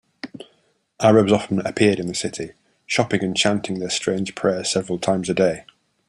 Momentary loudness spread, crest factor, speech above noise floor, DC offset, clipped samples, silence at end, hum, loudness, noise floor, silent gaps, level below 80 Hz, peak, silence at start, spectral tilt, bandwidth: 16 LU; 20 dB; 44 dB; under 0.1%; under 0.1%; 0.45 s; none; -20 LUFS; -64 dBFS; none; -56 dBFS; -2 dBFS; 0.25 s; -4.5 dB/octave; 11.5 kHz